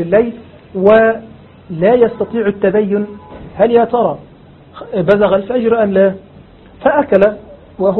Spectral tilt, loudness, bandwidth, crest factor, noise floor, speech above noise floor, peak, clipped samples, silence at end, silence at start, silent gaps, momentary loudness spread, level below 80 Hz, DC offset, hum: -9.5 dB/octave; -13 LUFS; 4.3 kHz; 14 dB; -40 dBFS; 28 dB; 0 dBFS; under 0.1%; 0 s; 0 s; none; 18 LU; -44 dBFS; under 0.1%; none